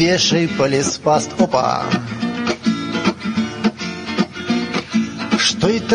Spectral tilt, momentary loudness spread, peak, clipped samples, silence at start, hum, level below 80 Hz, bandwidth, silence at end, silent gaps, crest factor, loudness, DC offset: -4 dB/octave; 6 LU; -2 dBFS; under 0.1%; 0 s; none; -50 dBFS; 10.5 kHz; 0 s; none; 16 dB; -18 LUFS; under 0.1%